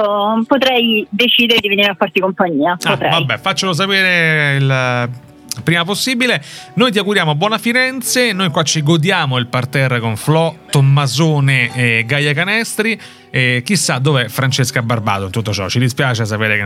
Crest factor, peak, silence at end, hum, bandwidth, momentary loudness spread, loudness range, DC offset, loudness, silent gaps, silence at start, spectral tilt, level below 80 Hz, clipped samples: 14 dB; 0 dBFS; 0 s; none; 16 kHz; 6 LU; 2 LU; under 0.1%; -14 LUFS; none; 0 s; -4.5 dB/octave; -56 dBFS; under 0.1%